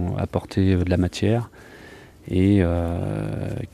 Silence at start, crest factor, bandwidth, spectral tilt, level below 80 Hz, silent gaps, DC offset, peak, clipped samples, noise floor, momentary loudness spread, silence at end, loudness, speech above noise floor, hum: 0 s; 18 dB; 11.5 kHz; -8 dB/octave; -40 dBFS; none; under 0.1%; -4 dBFS; under 0.1%; -45 dBFS; 18 LU; 0.05 s; -22 LUFS; 23 dB; none